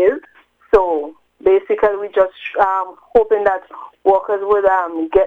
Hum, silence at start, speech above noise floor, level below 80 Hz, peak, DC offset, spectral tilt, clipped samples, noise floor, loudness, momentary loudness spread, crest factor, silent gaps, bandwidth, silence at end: none; 0 s; 34 dB; -44 dBFS; 0 dBFS; under 0.1%; -6.5 dB/octave; under 0.1%; -49 dBFS; -16 LUFS; 8 LU; 16 dB; none; 4.5 kHz; 0 s